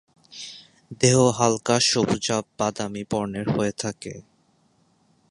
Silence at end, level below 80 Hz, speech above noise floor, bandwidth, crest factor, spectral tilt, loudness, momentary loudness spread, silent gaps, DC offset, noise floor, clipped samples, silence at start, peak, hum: 1.1 s; -56 dBFS; 41 dB; 11.5 kHz; 22 dB; -4 dB/octave; -22 LUFS; 20 LU; none; under 0.1%; -63 dBFS; under 0.1%; 0.3 s; -2 dBFS; none